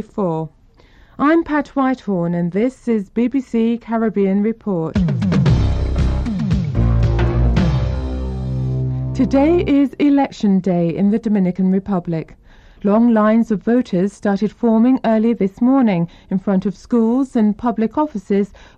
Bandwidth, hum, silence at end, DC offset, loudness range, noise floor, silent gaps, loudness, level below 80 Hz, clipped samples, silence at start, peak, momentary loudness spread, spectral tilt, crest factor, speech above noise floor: 8.6 kHz; none; 0.3 s; under 0.1%; 3 LU; -48 dBFS; none; -17 LUFS; -28 dBFS; under 0.1%; 0 s; -4 dBFS; 7 LU; -9 dB/octave; 12 dB; 31 dB